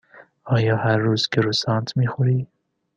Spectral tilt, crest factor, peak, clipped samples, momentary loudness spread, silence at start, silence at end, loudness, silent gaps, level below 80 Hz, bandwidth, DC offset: -6 dB/octave; 18 dB; -4 dBFS; under 0.1%; 4 LU; 0.15 s; 0.5 s; -21 LUFS; none; -58 dBFS; 8.6 kHz; under 0.1%